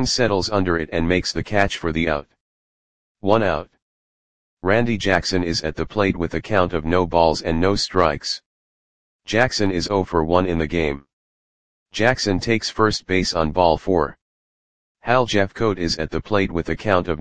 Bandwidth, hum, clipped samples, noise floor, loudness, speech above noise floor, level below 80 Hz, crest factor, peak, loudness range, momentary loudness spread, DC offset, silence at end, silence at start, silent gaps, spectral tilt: 10 kHz; none; under 0.1%; under -90 dBFS; -20 LUFS; over 70 dB; -40 dBFS; 20 dB; 0 dBFS; 3 LU; 7 LU; 2%; 0 s; 0 s; 2.41-3.15 s, 3.82-4.57 s, 8.46-9.19 s, 11.13-11.86 s, 14.21-14.95 s; -5 dB/octave